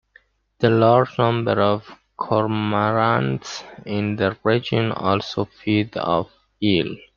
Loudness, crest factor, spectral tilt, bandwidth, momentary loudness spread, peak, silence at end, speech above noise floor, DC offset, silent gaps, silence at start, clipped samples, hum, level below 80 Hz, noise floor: -21 LUFS; 18 dB; -7 dB/octave; 7.2 kHz; 10 LU; -2 dBFS; 0.2 s; 36 dB; under 0.1%; none; 0.6 s; under 0.1%; none; -56 dBFS; -56 dBFS